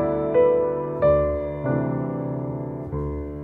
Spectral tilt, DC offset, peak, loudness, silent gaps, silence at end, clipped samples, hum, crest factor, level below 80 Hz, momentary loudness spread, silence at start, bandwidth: -11.5 dB/octave; under 0.1%; -8 dBFS; -23 LUFS; none; 0 s; under 0.1%; none; 16 dB; -38 dBFS; 11 LU; 0 s; 3.8 kHz